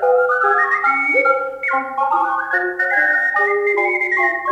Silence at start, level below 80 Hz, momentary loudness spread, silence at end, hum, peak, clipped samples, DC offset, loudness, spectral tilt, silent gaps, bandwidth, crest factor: 0 s; -62 dBFS; 5 LU; 0 s; none; -4 dBFS; under 0.1%; under 0.1%; -16 LUFS; -4 dB/octave; none; 10.5 kHz; 14 dB